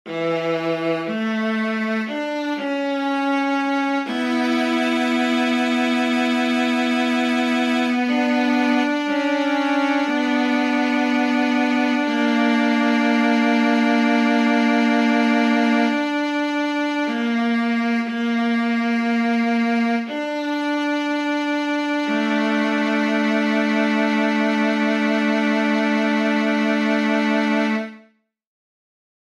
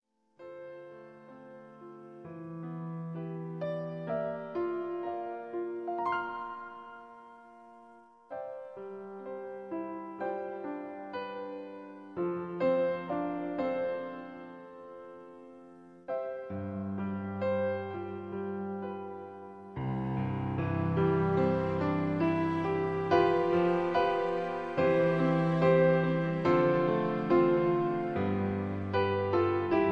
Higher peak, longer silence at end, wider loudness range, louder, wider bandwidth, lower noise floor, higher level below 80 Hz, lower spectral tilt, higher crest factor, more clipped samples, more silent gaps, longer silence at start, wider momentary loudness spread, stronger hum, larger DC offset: first, -6 dBFS vs -12 dBFS; first, 1.3 s vs 0 s; second, 4 LU vs 14 LU; first, -20 LUFS vs -31 LUFS; first, 12 kHz vs 6.6 kHz; about the same, -57 dBFS vs -57 dBFS; second, -78 dBFS vs -64 dBFS; second, -5 dB/octave vs -9 dB/octave; second, 14 dB vs 20 dB; neither; neither; second, 0.05 s vs 0.4 s; second, 5 LU vs 21 LU; neither; neither